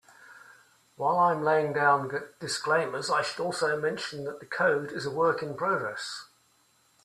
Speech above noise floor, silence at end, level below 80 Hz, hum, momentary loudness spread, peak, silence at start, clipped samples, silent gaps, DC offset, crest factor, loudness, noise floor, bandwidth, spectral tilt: 38 dB; 0.8 s; -74 dBFS; none; 11 LU; -10 dBFS; 0.2 s; under 0.1%; none; under 0.1%; 18 dB; -28 LUFS; -66 dBFS; 14 kHz; -4 dB/octave